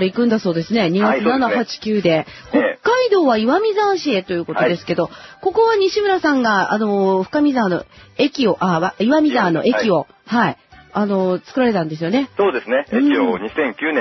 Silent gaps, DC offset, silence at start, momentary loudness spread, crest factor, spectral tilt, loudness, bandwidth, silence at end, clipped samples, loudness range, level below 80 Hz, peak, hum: none; under 0.1%; 0 s; 6 LU; 14 dB; -6 dB/octave; -17 LUFS; 6.2 kHz; 0 s; under 0.1%; 2 LU; -56 dBFS; -2 dBFS; none